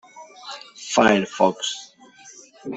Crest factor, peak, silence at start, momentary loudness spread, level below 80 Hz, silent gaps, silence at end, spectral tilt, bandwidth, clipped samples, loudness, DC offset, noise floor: 22 dB; -2 dBFS; 0.15 s; 20 LU; -64 dBFS; none; 0 s; -3.5 dB/octave; 8.4 kHz; under 0.1%; -20 LUFS; under 0.1%; -48 dBFS